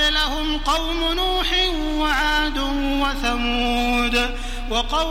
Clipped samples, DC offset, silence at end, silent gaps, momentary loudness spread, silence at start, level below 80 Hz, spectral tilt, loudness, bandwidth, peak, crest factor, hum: under 0.1%; under 0.1%; 0 s; none; 4 LU; 0 s; -28 dBFS; -3 dB/octave; -21 LUFS; 16 kHz; -6 dBFS; 16 dB; none